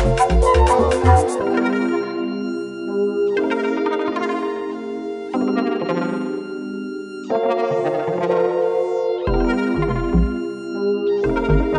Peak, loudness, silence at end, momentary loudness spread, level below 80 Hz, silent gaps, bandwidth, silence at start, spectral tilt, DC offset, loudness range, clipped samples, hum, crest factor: 0 dBFS; -20 LUFS; 0 s; 12 LU; -28 dBFS; none; 11.5 kHz; 0 s; -7 dB/octave; under 0.1%; 5 LU; under 0.1%; none; 18 dB